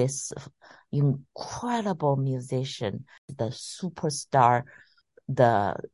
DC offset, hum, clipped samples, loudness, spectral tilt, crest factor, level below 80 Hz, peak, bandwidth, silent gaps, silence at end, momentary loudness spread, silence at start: under 0.1%; none; under 0.1%; -27 LUFS; -5.5 dB/octave; 22 dB; -60 dBFS; -6 dBFS; 11.5 kHz; 3.18-3.28 s; 0.05 s; 16 LU; 0 s